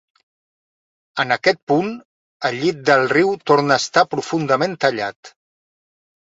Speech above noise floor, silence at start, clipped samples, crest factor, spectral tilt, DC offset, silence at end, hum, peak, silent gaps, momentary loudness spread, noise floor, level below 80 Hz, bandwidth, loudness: over 72 dB; 1.15 s; under 0.1%; 18 dB; -4.5 dB/octave; under 0.1%; 0.95 s; none; -2 dBFS; 1.63-1.67 s, 2.05-2.40 s, 5.16-5.23 s; 11 LU; under -90 dBFS; -64 dBFS; 8 kHz; -18 LUFS